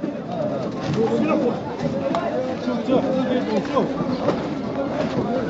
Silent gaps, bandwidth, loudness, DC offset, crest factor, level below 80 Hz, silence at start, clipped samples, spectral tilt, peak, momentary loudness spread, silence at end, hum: none; 8 kHz; -23 LUFS; under 0.1%; 16 dB; -52 dBFS; 0 s; under 0.1%; -6 dB/octave; -6 dBFS; 5 LU; 0 s; none